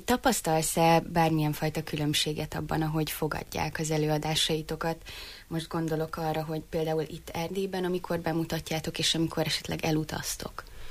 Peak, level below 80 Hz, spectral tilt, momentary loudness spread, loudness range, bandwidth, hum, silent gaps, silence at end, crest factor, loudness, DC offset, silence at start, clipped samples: -12 dBFS; -50 dBFS; -4.5 dB/octave; 8 LU; 5 LU; 15.5 kHz; none; none; 0 s; 18 dB; -29 LUFS; under 0.1%; 0 s; under 0.1%